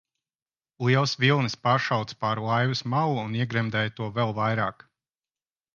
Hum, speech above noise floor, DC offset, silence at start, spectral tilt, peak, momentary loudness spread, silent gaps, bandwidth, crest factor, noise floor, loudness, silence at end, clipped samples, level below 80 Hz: none; over 65 dB; under 0.1%; 0.8 s; -6 dB/octave; -8 dBFS; 6 LU; none; 7.2 kHz; 20 dB; under -90 dBFS; -25 LUFS; 1.05 s; under 0.1%; -64 dBFS